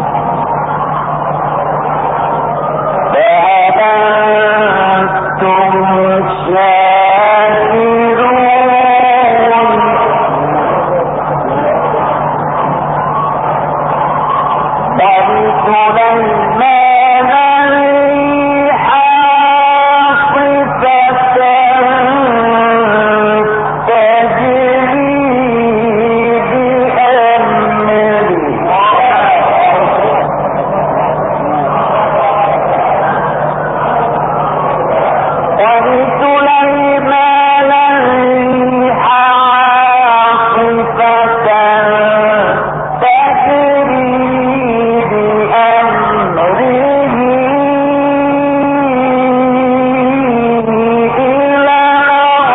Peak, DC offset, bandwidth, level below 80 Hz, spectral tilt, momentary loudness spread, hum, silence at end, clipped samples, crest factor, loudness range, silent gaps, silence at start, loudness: 0 dBFS; under 0.1%; 4 kHz; -42 dBFS; -9.5 dB/octave; 6 LU; none; 0 s; under 0.1%; 10 dB; 4 LU; none; 0 s; -9 LUFS